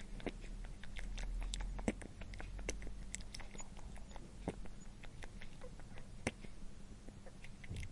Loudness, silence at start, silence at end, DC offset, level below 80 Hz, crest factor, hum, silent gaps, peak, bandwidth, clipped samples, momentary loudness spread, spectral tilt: -50 LUFS; 0 s; 0 s; under 0.1%; -48 dBFS; 26 dB; none; none; -20 dBFS; 11.5 kHz; under 0.1%; 11 LU; -4.5 dB/octave